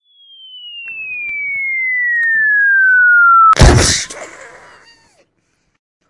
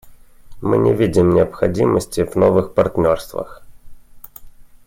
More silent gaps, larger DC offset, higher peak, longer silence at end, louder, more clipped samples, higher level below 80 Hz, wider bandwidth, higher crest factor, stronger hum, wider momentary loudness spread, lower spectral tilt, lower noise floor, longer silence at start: neither; neither; about the same, 0 dBFS vs -2 dBFS; first, 1.6 s vs 0.25 s; first, -10 LUFS vs -16 LUFS; neither; first, -24 dBFS vs -42 dBFS; second, 11.5 kHz vs 16.5 kHz; about the same, 14 dB vs 16 dB; neither; first, 21 LU vs 12 LU; second, -3.5 dB/octave vs -7.5 dB/octave; first, -63 dBFS vs -39 dBFS; first, 0.55 s vs 0.05 s